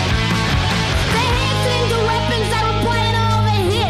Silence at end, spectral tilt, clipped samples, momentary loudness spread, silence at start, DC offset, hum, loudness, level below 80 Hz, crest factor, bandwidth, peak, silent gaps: 0 s; -5 dB/octave; under 0.1%; 1 LU; 0 s; under 0.1%; none; -17 LUFS; -28 dBFS; 10 dB; 14.5 kHz; -8 dBFS; none